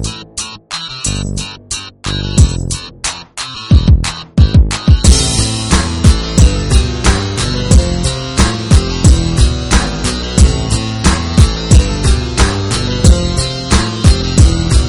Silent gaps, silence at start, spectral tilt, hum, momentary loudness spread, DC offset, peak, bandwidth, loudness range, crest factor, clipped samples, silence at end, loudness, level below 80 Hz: none; 0 s; -4.5 dB/octave; none; 11 LU; under 0.1%; 0 dBFS; 11.5 kHz; 4 LU; 10 dB; 0.6%; 0 s; -13 LUFS; -14 dBFS